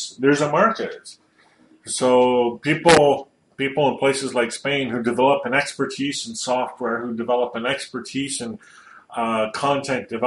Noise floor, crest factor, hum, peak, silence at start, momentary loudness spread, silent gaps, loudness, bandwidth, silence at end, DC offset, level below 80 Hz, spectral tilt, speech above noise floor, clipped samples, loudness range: -55 dBFS; 20 dB; none; -2 dBFS; 0 s; 12 LU; none; -21 LUFS; 11.5 kHz; 0 s; under 0.1%; -58 dBFS; -4 dB/octave; 35 dB; under 0.1%; 6 LU